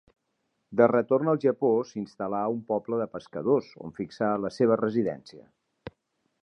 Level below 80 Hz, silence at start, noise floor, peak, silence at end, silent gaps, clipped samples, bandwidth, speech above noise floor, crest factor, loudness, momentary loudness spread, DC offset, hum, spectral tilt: -68 dBFS; 0.7 s; -77 dBFS; -6 dBFS; 0.55 s; none; under 0.1%; 9.2 kHz; 51 dB; 22 dB; -27 LUFS; 18 LU; under 0.1%; none; -8 dB/octave